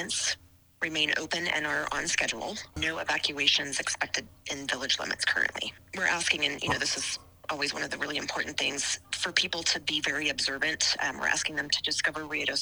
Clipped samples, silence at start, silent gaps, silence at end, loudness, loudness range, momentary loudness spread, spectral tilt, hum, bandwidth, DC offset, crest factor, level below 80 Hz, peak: under 0.1%; 0 s; none; 0 s; -28 LUFS; 2 LU; 7 LU; -1 dB/octave; none; over 20 kHz; under 0.1%; 24 dB; -58 dBFS; -8 dBFS